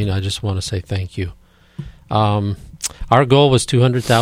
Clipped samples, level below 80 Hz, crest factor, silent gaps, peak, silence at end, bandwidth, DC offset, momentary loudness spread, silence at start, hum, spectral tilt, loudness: under 0.1%; -38 dBFS; 18 dB; none; 0 dBFS; 0 s; 16 kHz; under 0.1%; 16 LU; 0 s; none; -5.5 dB/octave; -17 LUFS